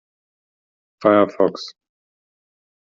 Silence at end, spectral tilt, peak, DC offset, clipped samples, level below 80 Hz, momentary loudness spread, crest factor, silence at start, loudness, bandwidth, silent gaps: 1.15 s; -4.5 dB/octave; -2 dBFS; under 0.1%; under 0.1%; -68 dBFS; 18 LU; 20 dB; 1 s; -18 LUFS; 7.4 kHz; none